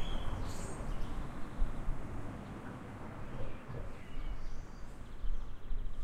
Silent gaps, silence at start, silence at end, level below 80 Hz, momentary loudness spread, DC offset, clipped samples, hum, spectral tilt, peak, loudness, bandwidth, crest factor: none; 0 s; 0 s; -40 dBFS; 6 LU; under 0.1%; under 0.1%; none; -6 dB/octave; -20 dBFS; -46 LUFS; 9.6 kHz; 16 dB